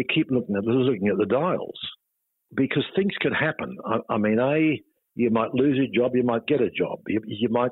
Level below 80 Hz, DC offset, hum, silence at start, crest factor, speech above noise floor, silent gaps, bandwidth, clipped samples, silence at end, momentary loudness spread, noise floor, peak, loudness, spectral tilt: -62 dBFS; under 0.1%; none; 0 s; 14 dB; 47 dB; none; 4.1 kHz; under 0.1%; 0 s; 7 LU; -70 dBFS; -10 dBFS; -24 LUFS; -10 dB/octave